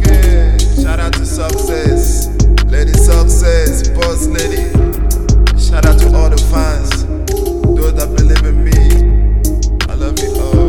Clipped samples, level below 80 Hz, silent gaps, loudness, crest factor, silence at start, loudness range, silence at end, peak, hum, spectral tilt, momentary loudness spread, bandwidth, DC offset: 0.4%; -10 dBFS; none; -13 LUFS; 10 dB; 0 s; 1 LU; 0 s; 0 dBFS; none; -5.5 dB/octave; 6 LU; 18.5 kHz; 5%